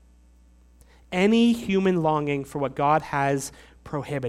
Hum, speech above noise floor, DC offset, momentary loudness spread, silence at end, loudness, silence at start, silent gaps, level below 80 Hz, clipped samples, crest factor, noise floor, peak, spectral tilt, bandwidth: none; 31 dB; under 0.1%; 12 LU; 0 s; -24 LUFS; 1.1 s; none; -54 dBFS; under 0.1%; 16 dB; -54 dBFS; -8 dBFS; -6 dB/octave; 14.5 kHz